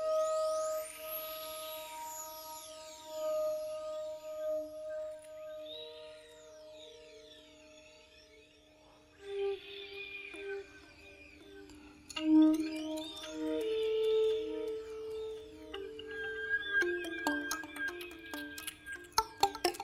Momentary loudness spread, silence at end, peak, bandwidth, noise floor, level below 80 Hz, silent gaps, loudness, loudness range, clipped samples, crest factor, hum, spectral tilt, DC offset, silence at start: 22 LU; 0 s; -10 dBFS; 16 kHz; -62 dBFS; -68 dBFS; none; -37 LUFS; 15 LU; under 0.1%; 28 dB; none; -2.5 dB/octave; under 0.1%; 0 s